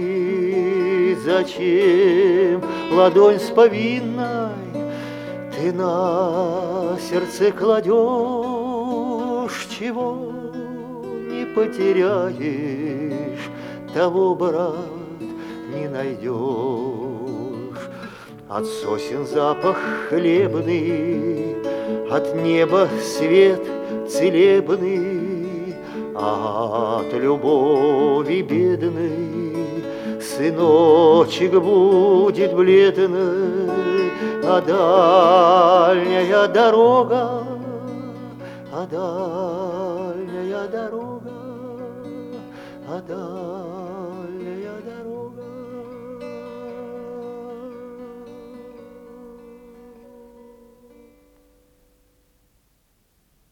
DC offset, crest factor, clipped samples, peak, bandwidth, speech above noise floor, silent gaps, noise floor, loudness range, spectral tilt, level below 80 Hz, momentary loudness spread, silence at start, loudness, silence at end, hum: under 0.1%; 18 dB; under 0.1%; 0 dBFS; 14.5 kHz; 46 dB; none; -63 dBFS; 17 LU; -6 dB/octave; -62 dBFS; 20 LU; 0 s; -19 LUFS; 3.3 s; none